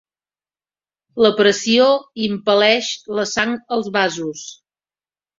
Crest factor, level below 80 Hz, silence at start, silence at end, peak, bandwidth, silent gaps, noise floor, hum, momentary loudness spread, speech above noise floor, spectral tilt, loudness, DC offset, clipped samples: 18 dB; -60 dBFS; 1.15 s; 0.85 s; -2 dBFS; 7.8 kHz; none; under -90 dBFS; 50 Hz at -45 dBFS; 13 LU; over 73 dB; -3 dB/octave; -17 LUFS; under 0.1%; under 0.1%